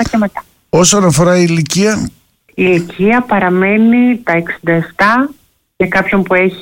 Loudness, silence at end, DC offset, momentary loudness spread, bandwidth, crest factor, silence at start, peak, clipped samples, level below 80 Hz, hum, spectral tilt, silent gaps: -11 LUFS; 0 s; under 0.1%; 9 LU; 17 kHz; 10 dB; 0 s; 0 dBFS; under 0.1%; -40 dBFS; none; -5 dB/octave; none